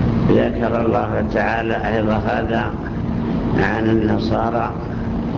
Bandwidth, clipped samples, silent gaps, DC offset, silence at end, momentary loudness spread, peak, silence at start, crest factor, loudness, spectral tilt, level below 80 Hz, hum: 7 kHz; under 0.1%; none; under 0.1%; 0 s; 7 LU; -4 dBFS; 0 s; 14 dB; -19 LUFS; -8.5 dB/octave; -32 dBFS; none